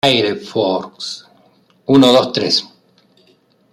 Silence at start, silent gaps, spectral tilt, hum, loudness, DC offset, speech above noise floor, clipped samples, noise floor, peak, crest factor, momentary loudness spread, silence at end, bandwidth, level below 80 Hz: 0.05 s; none; -4.5 dB/octave; none; -15 LUFS; under 0.1%; 41 dB; under 0.1%; -55 dBFS; -2 dBFS; 16 dB; 17 LU; 1.05 s; 14 kHz; -58 dBFS